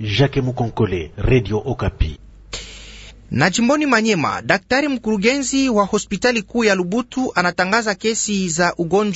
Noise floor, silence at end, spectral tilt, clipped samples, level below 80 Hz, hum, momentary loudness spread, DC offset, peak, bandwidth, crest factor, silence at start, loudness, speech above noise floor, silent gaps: -39 dBFS; 0 s; -4.5 dB/octave; under 0.1%; -34 dBFS; none; 10 LU; under 0.1%; 0 dBFS; 8 kHz; 18 dB; 0 s; -18 LUFS; 21 dB; none